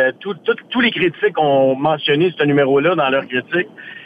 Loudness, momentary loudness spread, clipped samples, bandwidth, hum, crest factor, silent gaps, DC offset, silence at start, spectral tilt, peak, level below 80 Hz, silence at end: -16 LUFS; 7 LU; under 0.1%; 5 kHz; none; 12 dB; none; under 0.1%; 0 s; -8 dB/octave; -4 dBFS; -62 dBFS; 0 s